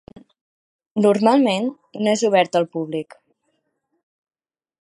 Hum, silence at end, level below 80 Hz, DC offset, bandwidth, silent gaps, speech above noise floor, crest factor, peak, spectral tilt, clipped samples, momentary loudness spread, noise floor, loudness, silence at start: none; 1.8 s; -70 dBFS; under 0.1%; 11.5 kHz; none; 54 dB; 20 dB; -2 dBFS; -5 dB/octave; under 0.1%; 13 LU; -72 dBFS; -19 LUFS; 0.95 s